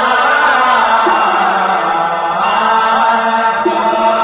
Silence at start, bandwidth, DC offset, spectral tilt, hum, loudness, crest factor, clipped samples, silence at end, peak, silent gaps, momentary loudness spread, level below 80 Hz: 0 s; 4 kHz; under 0.1%; -7 dB/octave; none; -11 LUFS; 10 dB; under 0.1%; 0 s; 0 dBFS; none; 4 LU; -52 dBFS